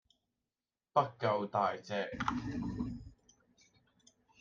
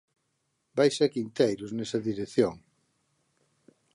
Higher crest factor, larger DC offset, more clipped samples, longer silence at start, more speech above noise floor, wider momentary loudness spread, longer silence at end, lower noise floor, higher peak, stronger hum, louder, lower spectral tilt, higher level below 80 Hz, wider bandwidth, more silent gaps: about the same, 24 dB vs 20 dB; neither; neither; first, 0.95 s vs 0.75 s; first, over 55 dB vs 50 dB; about the same, 8 LU vs 8 LU; second, 1.25 s vs 1.4 s; first, under -90 dBFS vs -77 dBFS; second, -16 dBFS vs -10 dBFS; neither; second, -36 LUFS vs -28 LUFS; about the same, -6.5 dB/octave vs -5.5 dB/octave; first, -60 dBFS vs -68 dBFS; second, 7.4 kHz vs 11.5 kHz; neither